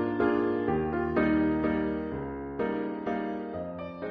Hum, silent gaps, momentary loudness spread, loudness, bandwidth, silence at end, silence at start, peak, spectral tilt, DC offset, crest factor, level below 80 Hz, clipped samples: none; none; 10 LU; -30 LUFS; 5 kHz; 0 s; 0 s; -14 dBFS; -6.5 dB/octave; under 0.1%; 16 dB; -50 dBFS; under 0.1%